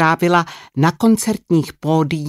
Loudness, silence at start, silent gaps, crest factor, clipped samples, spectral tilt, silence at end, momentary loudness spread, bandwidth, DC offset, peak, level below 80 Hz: -17 LUFS; 0 s; none; 14 dB; under 0.1%; -6 dB/octave; 0 s; 5 LU; 15.5 kHz; under 0.1%; -2 dBFS; -54 dBFS